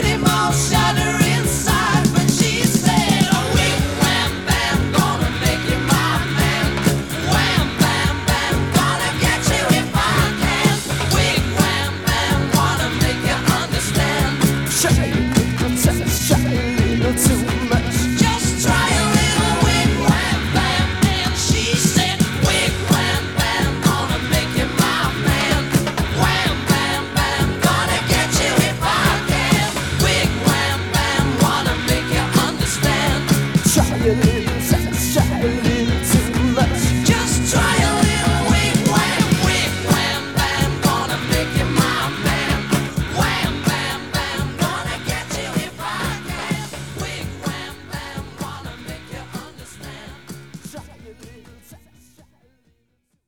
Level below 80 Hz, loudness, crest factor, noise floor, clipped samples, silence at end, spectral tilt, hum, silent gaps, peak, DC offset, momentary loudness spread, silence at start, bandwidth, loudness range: -30 dBFS; -17 LUFS; 18 dB; -67 dBFS; under 0.1%; 1.5 s; -4 dB/octave; none; none; 0 dBFS; 0.4%; 9 LU; 0 s; over 20 kHz; 8 LU